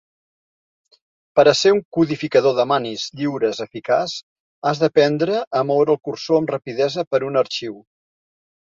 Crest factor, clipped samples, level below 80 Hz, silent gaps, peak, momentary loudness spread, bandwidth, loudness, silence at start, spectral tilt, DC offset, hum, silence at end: 18 dB; under 0.1%; -64 dBFS; 1.85-1.92 s, 4.23-4.62 s, 5.47-5.51 s, 7.07-7.11 s; -2 dBFS; 9 LU; 7.8 kHz; -19 LUFS; 1.35 s; -5 dB/octave; under 0.1%; none; 0.85 s